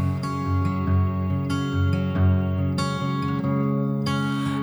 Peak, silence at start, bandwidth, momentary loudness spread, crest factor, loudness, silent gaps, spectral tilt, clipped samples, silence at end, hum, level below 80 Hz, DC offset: -12 dBFS; 0 s; over 20 kHz; 4 LU; 12 dB; -24 LUFS; none; -7.5 dB/octave; under 0.1%; 0 s; none; -44 dBFS; under 0.1%